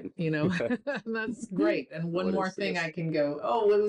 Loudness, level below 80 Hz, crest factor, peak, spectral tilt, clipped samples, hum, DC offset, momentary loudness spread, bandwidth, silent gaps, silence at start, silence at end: -30 LUFS; -68 dBFS; 12 dB; -18 dBFS; -6.5 dB/octave; under 0.1%; none; under 0.1%; 5 LU; 10.5 kHz; none; 0 s; 0 s